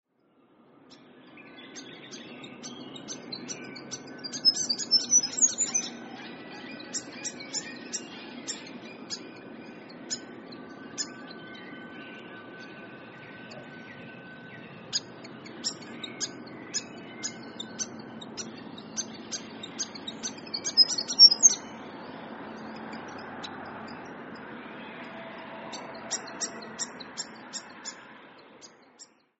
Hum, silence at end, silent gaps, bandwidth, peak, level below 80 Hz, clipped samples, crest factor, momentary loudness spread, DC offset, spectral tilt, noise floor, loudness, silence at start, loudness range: none; 0.35 s; none; 8 kHz; -6 dBFS; -76 dBFS; under 0.1%; 28 dB; 22 LU; under 0.1%; 0 dB/octave; -65 dBFS; -26 LUFS; 0.8 s; 20 LU